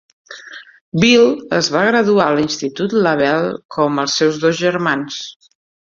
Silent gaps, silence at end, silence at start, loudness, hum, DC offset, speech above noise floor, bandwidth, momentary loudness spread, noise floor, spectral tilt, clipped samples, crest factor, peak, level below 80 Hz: 0.81-0.92 s, 3.65-3.69 s; 0.6 s; 0.3 s; -15 LUFS; none; under 0.1%; 22 dB; 7.6 kHz; 16 LU; -37 dBFS; -4.5 dB/octave; under 0.1%; 14 dB; -2 dBFS; -56 dBFS